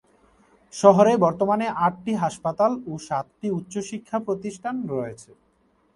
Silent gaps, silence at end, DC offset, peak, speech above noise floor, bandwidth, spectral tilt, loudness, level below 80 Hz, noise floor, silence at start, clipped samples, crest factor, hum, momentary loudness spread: none; 0.75 s; under 0.1%; 0 dBFS; 41 dB; 11.5 kHz; -6.5 dB/octave; -23 LUFS; -62 dBFS; -64 dBFS; 0.75 s; under 0.1%; 22 dB; none; 14 LU